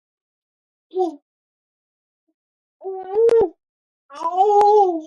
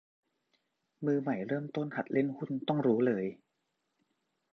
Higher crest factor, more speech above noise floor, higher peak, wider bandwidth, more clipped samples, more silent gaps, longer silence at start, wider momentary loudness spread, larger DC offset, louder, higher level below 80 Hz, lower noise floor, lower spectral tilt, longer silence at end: about the same, 16 dB vs 20 dB; first, over 74 dB vs 50 dB; first, -4 dBFS vs -16 dBFS; first, 10.5 kHz vs 6.2 kHz; neither; first, 1.22-2.27 s, 2.34-2.80 s, 3.69-4.09 s vs none; about the same, 0.95 s vs 1 s; first, 18 LU vs 8 LU; neither; first, -18 LUFS vs -33 LUFS; first, -62 dBFS vs -80 dBFS; first, under -90 dBFS vs -82 dBFS; second, -5.5 dB/octave vs -9 dB/octave; second, 0 s vs 1.2 s